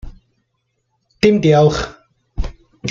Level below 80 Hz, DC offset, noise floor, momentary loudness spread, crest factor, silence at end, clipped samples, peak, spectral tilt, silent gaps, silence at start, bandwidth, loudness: -32 dBFS; under 0.1%; -69 dBFS; 18 LU; 18 dB; 0 s; under 0.1%; 0 dBFS; -6.5 dB/octave; none; 0.05 s; 7.6 kHz; -14 LUFS